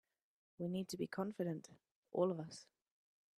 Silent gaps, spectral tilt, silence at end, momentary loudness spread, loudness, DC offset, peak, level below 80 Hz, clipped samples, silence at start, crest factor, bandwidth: 1.95-2.03 s; -6.5 dB/octave; 0.75 s; 13 LU; -43 LUFS; under 0.1%; -24 dBFS; -84 dBFS; under 0.1%; 0.6 s; 20 dB; 14 kHz